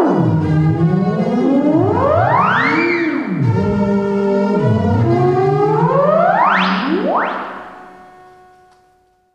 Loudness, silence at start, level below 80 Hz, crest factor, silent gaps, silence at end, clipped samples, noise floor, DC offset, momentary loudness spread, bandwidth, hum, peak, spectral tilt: -14 LUFS; 0 s; -46 dBFS; 14 dB; none; 1.4 s; under 0.1%; -55 dBFS; 0.1%; 5 LU; 8 kHz; none; -2 dBFS; -8.5 dB/octave